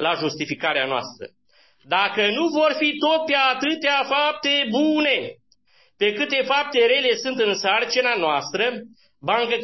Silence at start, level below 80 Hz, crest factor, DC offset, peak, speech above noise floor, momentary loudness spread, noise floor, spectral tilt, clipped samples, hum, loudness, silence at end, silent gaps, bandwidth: 0 s; -70 dBFS; 16 dB; under 0.1%; -6 dBFS; 39 dB; 7 LU; -60 dBFS; -3 dB/octave; under 0.1%; none; -20 LUFS; 0 s; none; 6.2 kHz